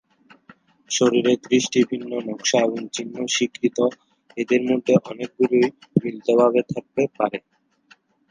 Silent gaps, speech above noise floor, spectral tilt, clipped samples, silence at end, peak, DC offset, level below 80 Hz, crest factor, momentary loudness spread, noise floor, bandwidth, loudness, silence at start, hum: none; 36 dB; -4.5 dB/octave; under 0.1%; 0.9 s; -2 dBFS; under 0.1%; -68 dBFS; 20 dB; 10 LU; -57 dBFS; 10 kHz; -21 LUFS; 0.9 s; none